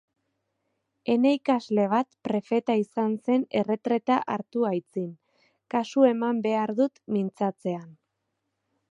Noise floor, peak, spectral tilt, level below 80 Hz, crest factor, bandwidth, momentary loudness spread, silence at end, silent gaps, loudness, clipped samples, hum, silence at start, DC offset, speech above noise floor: -80 dBFS; -8 dBFS; -7 dB/octave; -78 dBFS; 20 dB; 8 kHz; 9 LU; 1 s; none; -26 LUFS; under 0.1%; none; 1.05 s; under 0.1%; 54 dB